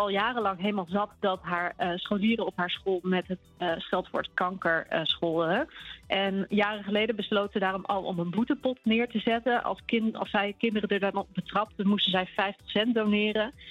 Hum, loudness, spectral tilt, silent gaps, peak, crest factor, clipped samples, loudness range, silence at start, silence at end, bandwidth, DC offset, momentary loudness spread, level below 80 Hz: none; -28 LUFS; -7 dB/octave; none; -12 dBFS; 18 dB; under 0.1%; 2 LU; 0 s; 0 s; 7.4 kHz; under 0.1%; 5 LU; -62 dBFS